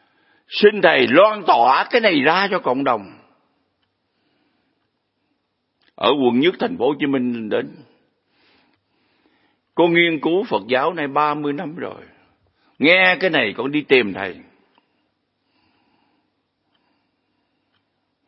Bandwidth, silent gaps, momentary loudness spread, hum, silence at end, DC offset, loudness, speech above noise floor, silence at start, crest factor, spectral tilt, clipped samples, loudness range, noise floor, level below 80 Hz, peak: 5.8 kHz; none; 12 LU; none; 3.85 s; under 0.1%; -17 LUFS; 54 dB; 0.5 s; 20 dB; -8 dB/octave; under 0.1%; 9 LU; -71 dBFS; -70 dBFS; 0 dBFS